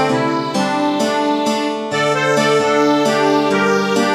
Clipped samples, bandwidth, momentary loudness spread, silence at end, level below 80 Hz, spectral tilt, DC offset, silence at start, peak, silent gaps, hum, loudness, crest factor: under 0.1%; 14.5 kHz; 4 LU; 0 s; -64 dBFS; -4.5 dB/octave; under 0.1%; 0 s; -2 dBFS; none; none; -16 LUFS; 14 dB